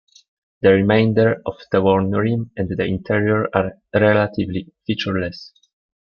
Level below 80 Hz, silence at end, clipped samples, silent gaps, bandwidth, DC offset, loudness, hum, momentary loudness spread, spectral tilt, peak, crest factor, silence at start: -52 dBFS; 0.6 s; under 0.1%; none; 6.8 kHz; under 0.1%; -19 LUFS; none; 11 LU; -8.5 dB/octave; -2 dBFS; 16 dB; 0.6 s